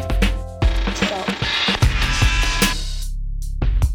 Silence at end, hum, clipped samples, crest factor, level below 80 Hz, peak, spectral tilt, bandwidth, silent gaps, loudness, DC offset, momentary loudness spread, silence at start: 0 s; none; under 0.1%; 16 dB; -22 dBFS; -4 dBFS; -4 dB/octave; 18 kHz; none; -20 LUFS; under 0.1%; 12 LU; 0 s